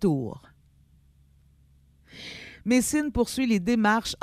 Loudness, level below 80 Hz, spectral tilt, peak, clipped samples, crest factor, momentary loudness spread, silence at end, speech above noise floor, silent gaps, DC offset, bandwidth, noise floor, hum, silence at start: -25 LUFS; -48 dBFS; -4.5 dB/octave; -8 dBFS; under 0.1%; 18 dB; 18 LU; 0.05 s; 35 dB; none; under 0.1%; 15.5 kHz; -59 dBFS; none; 0 s